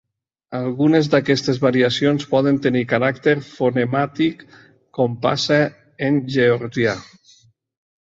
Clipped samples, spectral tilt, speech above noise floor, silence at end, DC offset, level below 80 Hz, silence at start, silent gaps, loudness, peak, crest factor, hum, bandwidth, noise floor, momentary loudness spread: under 0.1%; -6 dB/octave; 36 dB; 1 s; under 0.1%; -58 dBFS; 0.5 s; none; -19 LUFS; -2 dBFS; 16 dB; none; 7.8 kHz; -54 dBFS; 7 LU